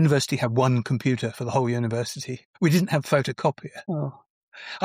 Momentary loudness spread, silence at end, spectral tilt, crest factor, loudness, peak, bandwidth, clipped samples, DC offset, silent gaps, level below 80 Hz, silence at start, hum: 13 LU; 0 s; -6 dB/octave; 16 dB; -25 LUFS; -8 dBFS; 16 kHz; under 0.1%; under 0.1%; 2.45-2.54 s, 4.30-4.52 s; -64 dBFS; 0 s; none